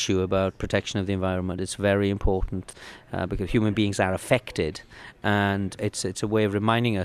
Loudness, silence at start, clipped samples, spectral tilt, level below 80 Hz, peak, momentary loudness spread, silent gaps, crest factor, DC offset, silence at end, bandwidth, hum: -26 LUFS; 0 s; under 0.1%; -5.5 dB/octave; -40 dBFS; -6 dBFS; 10 LU; none; 20 dB; under 0.1%; 0 s; 14 kHz; none